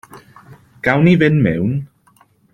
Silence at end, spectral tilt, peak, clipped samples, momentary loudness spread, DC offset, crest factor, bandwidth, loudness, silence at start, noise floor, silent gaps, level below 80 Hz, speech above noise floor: 0.7 s; -8.5 dB/octave; -2 dBFS; under 0.1%; 10 LU; under 0.1%; 16 dB; 7 kHz; -15 LUFS; 0.15 s; -54 dBFS; none; -48 dBFS; 40 dB